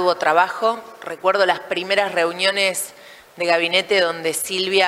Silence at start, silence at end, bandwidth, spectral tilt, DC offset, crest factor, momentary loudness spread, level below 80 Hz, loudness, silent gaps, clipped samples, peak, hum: 0 s; 0 s; 16 kHz; -2 dB/octave; under 0.1%; 18 dB; 8 LU; -70 dBFS; -19 LUFS; none; under 0.1%; -2 dBFS; none